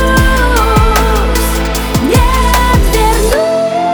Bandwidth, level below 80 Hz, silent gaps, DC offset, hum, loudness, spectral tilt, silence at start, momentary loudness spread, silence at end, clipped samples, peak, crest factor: over 20 kHz; -14 dBFS; none; under 0.1%; none; -11 LUFS; -4.5 dB/octave; 0 s; 4 LU; 0 s; 0.1%; 0 dBFS; 10 dB